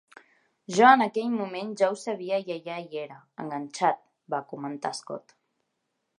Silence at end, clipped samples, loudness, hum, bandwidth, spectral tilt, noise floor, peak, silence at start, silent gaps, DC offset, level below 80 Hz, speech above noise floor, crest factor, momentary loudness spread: 1 s; under 0.1%; -27 LUFS; none; 11 kHz; -4.5 dB/octave; -79 dBFS; -4 dBFS; 0.7 s; none; under 0.1%; -82 dBFS; 53 dB; 24 dB; 19 LU